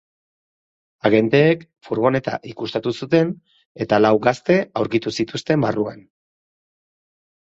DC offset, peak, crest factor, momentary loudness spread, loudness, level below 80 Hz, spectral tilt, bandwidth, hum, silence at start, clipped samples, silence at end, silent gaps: under 0.1%; -2 dBFS; 18 dB; 12 LU; -19 LUFS; -58 dBFS; -6.5 dB/octave; 8 kHz; none; 1.05 s; under 0.1%; 1.6 s; 3.66-3.75 s